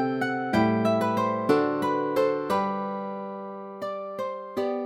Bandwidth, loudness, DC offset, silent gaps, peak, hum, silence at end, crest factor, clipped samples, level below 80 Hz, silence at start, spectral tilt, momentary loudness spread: 16.5 kHz; -27 LUFS; under 0.1%; none; -8 dBFS; none; 0 s; 18 dB; under 0.1%; -66 dBFS; 0 s; -7 dB/octave; 11 LU